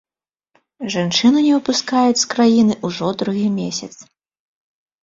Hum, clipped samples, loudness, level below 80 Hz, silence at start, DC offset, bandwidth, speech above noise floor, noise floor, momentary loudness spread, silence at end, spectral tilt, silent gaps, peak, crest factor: none; under 0.1%; -17 LUFS; -58 dBFS; 0.8 s; under 0.1%; 7.8 kHz; 67 dB; -84 dBFS; 11 LU; 1 s; -4 dB/octave; none; -2 dBFS; 16 dB